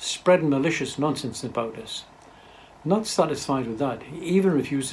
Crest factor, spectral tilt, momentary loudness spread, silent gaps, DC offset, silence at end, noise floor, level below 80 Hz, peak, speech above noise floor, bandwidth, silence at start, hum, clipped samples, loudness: 18 dB; -5 dB/octave; 13 LU; none; under 0.1%; 0 s; -49 dBFS; -60 dBFS; -6 dBFS; 25 dB; 15 kHz; 0 s; none; under 0.1%; -25 LUFS